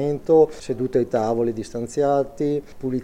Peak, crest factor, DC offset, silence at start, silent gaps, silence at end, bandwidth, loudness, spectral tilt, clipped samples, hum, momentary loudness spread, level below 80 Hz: -6 dBFS; 16 dB; under 0.1%; 0 s; none; 0 s; 11 kHz; -22 LUFS; -7.5 dB/octave; under 0.1%; none; 10 LU; -48 dBFS